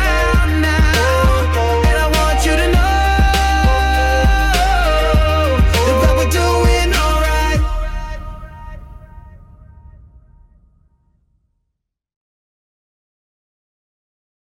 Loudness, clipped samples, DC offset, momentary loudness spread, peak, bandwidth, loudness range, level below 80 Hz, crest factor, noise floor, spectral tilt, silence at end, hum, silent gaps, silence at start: -14 LUFS; under 0.1%; under 0.1%; 12 LU; -4 dBFS; 16 kHz; 9 LU; -18 dBFS; 12 dB; -75 dBFS; -5 dB/octave; 5.4 s; none; none; 0 s